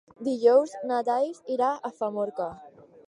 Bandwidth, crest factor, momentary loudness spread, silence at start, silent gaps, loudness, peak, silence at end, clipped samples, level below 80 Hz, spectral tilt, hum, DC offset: 10.5 kHz; 18 dB; 11 LU; 0.2 s; none; -26 LUFS; -8 dBFS; 0.4 s; under 0.1%; -70 dBFS; -5.5 dB/octave; none; under 0.1%